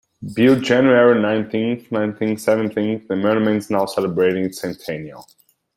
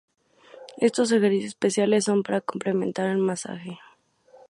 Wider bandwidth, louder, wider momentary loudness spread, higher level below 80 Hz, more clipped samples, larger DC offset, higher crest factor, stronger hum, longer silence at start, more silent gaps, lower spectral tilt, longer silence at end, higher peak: first, 16 kHz vs 11.5 kHz; first, -18 LUFS vs -24 LUFS; about the same, 14 LU vs 16 LU; first, -60 dBFS vs -72 dBFS; neither; neither; about the same, 16 dB vs 18 dB; neither; second, 0.2 s vs 0.55 s; neither; first, -6.5 dB/octave vs -5 dB/octave; second, 0.55 s vs 0.7 s; first, -2 dBFS vs -8 dBFS